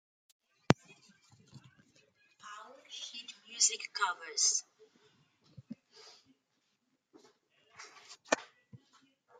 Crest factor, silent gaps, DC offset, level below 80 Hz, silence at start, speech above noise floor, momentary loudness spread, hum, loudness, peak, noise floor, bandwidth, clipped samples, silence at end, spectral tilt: 38 dB; none; under 0.1%; -74 dBFS; 0.7 s; 47 dB; 25 LU; none; -33 LUFS; -2 dBFS; -80 dBFS; 11.5 kHz; under 0.1%; 0.65 s; -2 dB/octave